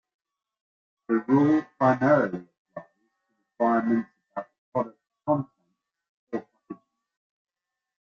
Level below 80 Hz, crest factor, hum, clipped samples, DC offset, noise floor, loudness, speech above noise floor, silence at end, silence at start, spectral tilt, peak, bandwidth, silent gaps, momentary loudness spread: -70 dBFS; 20 dB; none; under 0.1%; under 0.1%; -77 dBFS; -25 LUFS; 54 dB; 1.45 s; 1.1 s; -9 dB/octave; -8 dBFS; 6.8 kHz; 2.58-2.65 s, 4.58-4.72 s, 6.09-6.27 s; 23 LU